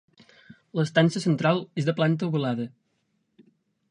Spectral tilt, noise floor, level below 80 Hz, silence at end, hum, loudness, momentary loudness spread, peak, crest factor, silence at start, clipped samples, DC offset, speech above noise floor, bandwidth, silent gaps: -6.5 dB/octave; -73 dBFS; -68 dBFS; 1.25 s; none; -25 LUFS; 10 LU; -4 dBFS; 22 dB; 0.75 s; under 0.1%; under 0.1%; 49 dB; 10.5 kHz; none